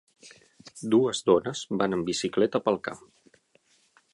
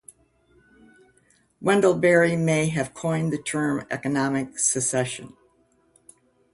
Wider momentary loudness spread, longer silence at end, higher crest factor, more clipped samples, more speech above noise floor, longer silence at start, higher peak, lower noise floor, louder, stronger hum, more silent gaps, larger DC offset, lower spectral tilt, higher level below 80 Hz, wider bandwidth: first, 15 LU vs 9 LU; about the same, 1.15 s vs 1.25 s; about the same, 20 dB vs 20 dB; neither; about the same, 40 dB vs 40 dB; second, 0.25 s vs 1.6 s; about the same, -8 dBFS vs -6 dBFS; about the same, -65 dBFS vs -63 dBFS; second, -26 LUFS vs -23 LUFS; neither; neither; neither; about the same, -5 dB/octave vs -4.5 dB/octave; about the same, -66 dBFS vs -62 dBFS; about the same, 11.5 kHz vs 11.5 kHz